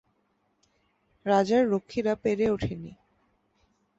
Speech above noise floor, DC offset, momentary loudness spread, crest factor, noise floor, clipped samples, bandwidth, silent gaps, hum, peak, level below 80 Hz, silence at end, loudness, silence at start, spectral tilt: 47 dB; under 0.1%; 14 LU; 18 dB; -72 dBFS; under 0.1%; 8 kHz; none; none; -10 dBFS; -54 dBFS; 1.05 s; -26 LUFS; 1.25 s; -6.5 dB/octave